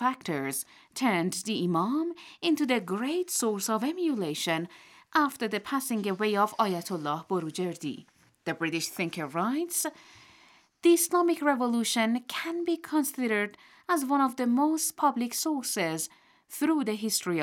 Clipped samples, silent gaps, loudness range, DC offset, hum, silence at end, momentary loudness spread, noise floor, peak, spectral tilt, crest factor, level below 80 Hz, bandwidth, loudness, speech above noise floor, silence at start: under 0.1%; none; 4 LU; under 0.1%; none; 0 s; 8 LU; -60 dBFS; -12 dBFS; -3.5 dB/octave; 18 dB; -82 dBFS; 18.5 kHz; -29 LUFS; 31 dB; 0 s